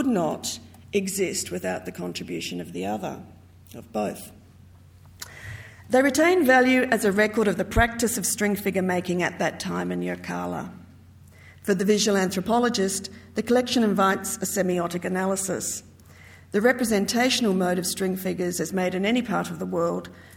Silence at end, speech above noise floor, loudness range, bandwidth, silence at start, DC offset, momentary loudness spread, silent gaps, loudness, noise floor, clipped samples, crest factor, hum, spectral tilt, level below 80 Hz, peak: 0 s; 26 dB; 10 LU; 18 kHz; 0 s; under 0.1%; 13 LU; none; -24 LUFS; -50 dBFS; under 0.1%; 20 dB; none; -4 dB/octave; -48 dBFS; -6 dBFS